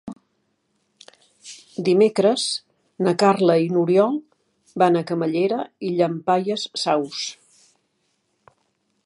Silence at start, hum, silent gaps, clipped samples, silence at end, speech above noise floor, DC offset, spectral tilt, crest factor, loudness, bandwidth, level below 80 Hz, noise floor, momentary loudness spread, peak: 0.05 s; none; none; under 0.1%; 1.75 s; 51 dB; under 0.1%; -5.5 dB/octave; 20 dB; -21 LUFS; 11.5 kHz; -72 dBFS; -70 dBFS; 13 LU; -2 dBFS